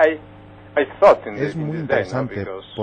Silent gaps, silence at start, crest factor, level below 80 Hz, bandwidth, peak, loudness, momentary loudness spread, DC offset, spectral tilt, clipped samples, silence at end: none; 0 s; 18 dB; -52 dBFS; 8.8 kHz; -2 dBFS; -20 LUFS; 14 LU; under 0.1%; -7 dB/octave; under 0.1%; 0 s